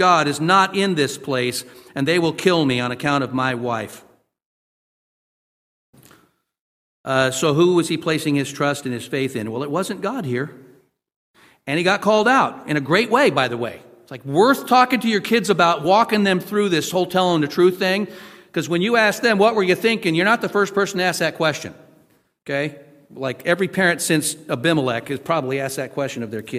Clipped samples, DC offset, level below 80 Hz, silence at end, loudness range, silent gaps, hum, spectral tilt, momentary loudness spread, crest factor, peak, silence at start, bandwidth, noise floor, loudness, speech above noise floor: under 0.1%; under 0.1%; -62 dBFS; 0 s; 7 LU; 4.45-5.93 s, 6.59-7.04 s, 11.16-11.34 s; none; -4.5 dB/octave; 11 LU; 18 dB; -2 dBFS; 0 s; 16 kHz; -58 dBFS; -19 LUFS; 39 dB